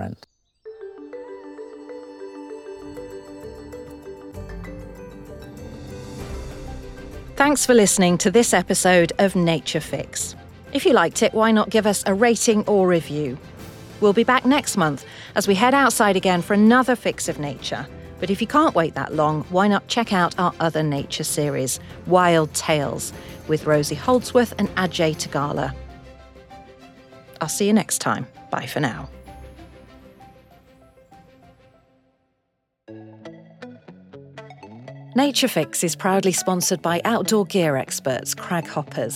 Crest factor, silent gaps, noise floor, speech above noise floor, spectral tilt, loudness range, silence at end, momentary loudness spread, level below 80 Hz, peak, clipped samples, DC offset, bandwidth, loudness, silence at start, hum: 20 dB; none; -75 dBFS; 55 dB; -4 dB/octave; 19 LU; 0 s; 22 LU; -48 dBFS; -2 dBFS; under 0.1%; under 0.1%; 16.5 kHz; -20 LUFS; 0 s; none